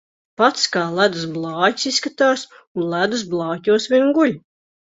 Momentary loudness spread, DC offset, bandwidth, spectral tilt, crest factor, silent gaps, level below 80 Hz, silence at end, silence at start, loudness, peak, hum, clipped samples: 9 LU; under 0.1%; 8 kHz; -4 dB/octave; 18 dB; 2.67-2.75 s; -64 dBFS; 0.55 s; 0.4 s; -19 LUFS; -2 dBFS; none; under 0.1%